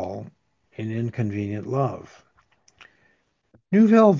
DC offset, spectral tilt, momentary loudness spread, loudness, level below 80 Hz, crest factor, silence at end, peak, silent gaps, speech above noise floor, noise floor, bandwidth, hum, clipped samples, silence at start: under 0.1%; -9 dB/octave; 22 LU; -23 LUFS; -58 dBFS; 20 dB; 0 s; -4 dBFS; none; 46 dB; -66 dBFS; 7.2 kHz; none; under 0.1%; 0 s